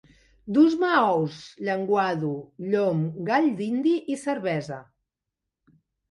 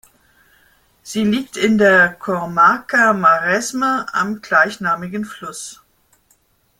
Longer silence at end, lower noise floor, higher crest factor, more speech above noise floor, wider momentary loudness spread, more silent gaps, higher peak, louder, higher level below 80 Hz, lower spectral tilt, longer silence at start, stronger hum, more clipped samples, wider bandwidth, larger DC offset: first, 1.3 s vs 1.05 s; first, -86 dBFS vs -59 dBFS; about the same, 18 dB vs 18 dB; first, 62 dB vs 43 dB; second, 11 LU vs 15 LU; neither; second, -8 dBFS vs 0 dBFS; second, -24 LUFS vs -16 LUFS; second, -68 dBFS vs -58 dBFS; first, -7 dB/octave vs -4.5 dB/octave; second, 0.45 s vs 1.05 s; neither; neither; second, 11.5 kHz vs 16.5 kHz; neither